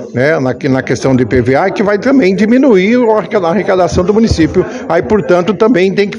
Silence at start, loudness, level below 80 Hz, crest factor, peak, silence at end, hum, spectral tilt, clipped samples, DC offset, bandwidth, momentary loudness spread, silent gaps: 0 s; -10 LUFS; -34 dBFS; 10 dB; 0 dBFS; 0 s; none; -6.5 dB/octave; 0.8%; under 0.1%; 10.5 kHz; 5 LU; none